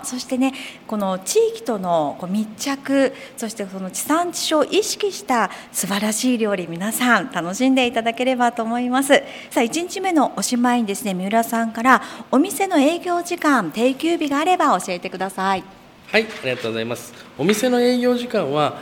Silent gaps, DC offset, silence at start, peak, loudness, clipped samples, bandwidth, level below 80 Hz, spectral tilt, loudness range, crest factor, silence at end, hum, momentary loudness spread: none; under 0.1%; 0 s; 0 dBFS; -20 LUFS; under 0.1%; 17.5 kHz; -64 dBFS; -3.5 dB/octave; 3 LU; 20 dB; 0 s; none; 8 LU